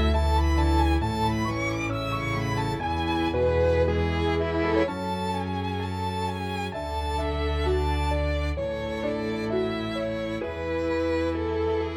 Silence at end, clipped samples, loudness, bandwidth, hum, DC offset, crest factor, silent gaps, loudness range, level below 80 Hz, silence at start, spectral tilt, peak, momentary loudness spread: 0 s; under 0.1%; -27 LUFS; 13.5 kHz; none; under 0.1%; 14 dB; none; 3 LU; -32 dBFS; 0 s; -6.5 dB/octave; -12 dBFS; 7 LU